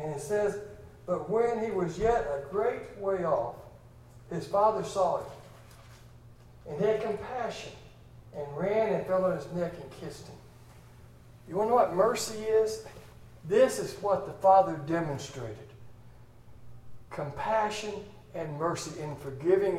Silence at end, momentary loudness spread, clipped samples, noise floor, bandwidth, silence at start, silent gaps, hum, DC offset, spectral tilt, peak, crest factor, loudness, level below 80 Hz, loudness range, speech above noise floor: 0 s; 18 LU; under 0.1%; -52 dBFS; 15.5 kHz; 0 s; none; none; under 0.1%; -5.5 dB/octave; -10 dBFS; 20 dB; -30 LUFS; -56 dBFS; 7 LU; 23 dB